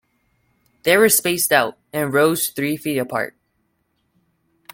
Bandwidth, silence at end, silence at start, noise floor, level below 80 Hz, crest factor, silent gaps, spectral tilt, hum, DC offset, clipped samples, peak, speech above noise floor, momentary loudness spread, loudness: 17 kHz; 1.45 s; 0.85 s; -68 dBFS; -62 dBFS; 20 dB; none; -3 dB/octave; none; under 0.1%; under 0.1%; 0 dBFS; 50 dB; 11 LU; -18 LUFS